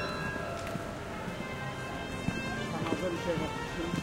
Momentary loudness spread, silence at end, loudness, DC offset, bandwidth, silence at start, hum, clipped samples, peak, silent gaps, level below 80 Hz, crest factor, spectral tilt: 5 LU; 0 s; -35 LUFS; under 0.1%; 16.5 kHz; 0 s; none; under 0.1%; -16 dBFS; none; -50 dBFS; 20 dB; -5.5 dB/octave